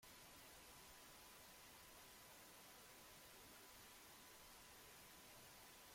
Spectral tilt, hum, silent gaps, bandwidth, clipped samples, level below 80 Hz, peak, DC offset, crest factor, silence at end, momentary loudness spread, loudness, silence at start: -1.5 dB/octave; none; none; 16.5 kHz; under 0.1%; -80 dBFS; -52 dBFS; under 0.1%; 12 dB; 0 s; 0 LU; -62 LUFS; 0 s